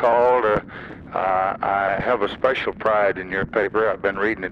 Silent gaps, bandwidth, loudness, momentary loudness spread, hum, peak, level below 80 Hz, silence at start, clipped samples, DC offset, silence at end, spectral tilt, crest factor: none; 7 kHz; -21 LUFS; 8 LU; none; -8 dBFS; -48 dBFS; 0 s; under 0.1%; under 0.1%; 0 s; -7 dB/octave; 14 dB